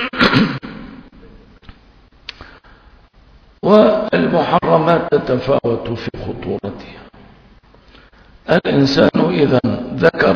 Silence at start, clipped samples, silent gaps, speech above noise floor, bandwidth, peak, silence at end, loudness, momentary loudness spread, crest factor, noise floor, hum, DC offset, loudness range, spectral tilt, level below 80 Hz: 0 s; under 0.1%; none; 33 dB; 5.4 kHz; 0 dBFS; 0 s; -15 LUFS; 22 LU; 16 dB; -47 dBFS; none; under 0.1%; 8 LU; -7 dB/octave; -44 dBFS